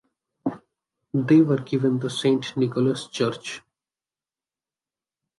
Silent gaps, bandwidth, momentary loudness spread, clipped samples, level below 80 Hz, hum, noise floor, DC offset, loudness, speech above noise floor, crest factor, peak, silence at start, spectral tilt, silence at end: none; 11.5 kHz; 14 LU; under 0.1%; -68 dBFS; none; under -90 dBFS; under 0.1%; -23 LUFS; over 68 dB; 18 dB; -8 dBFS; 0.45 s; -6.5 dB/octave; 1.8 s